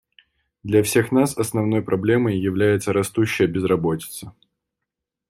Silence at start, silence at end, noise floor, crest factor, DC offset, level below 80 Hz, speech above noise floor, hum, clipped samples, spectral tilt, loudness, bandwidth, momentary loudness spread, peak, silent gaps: 0.65 s; 1 s; -83 dBFS; 18 dB; under 0.1%; -54 dBFS; 63 dB; none; under 0.1%; -6 dB/octave; -20 LUFS; 16 kHz; 8 LU; -4 dBFS; none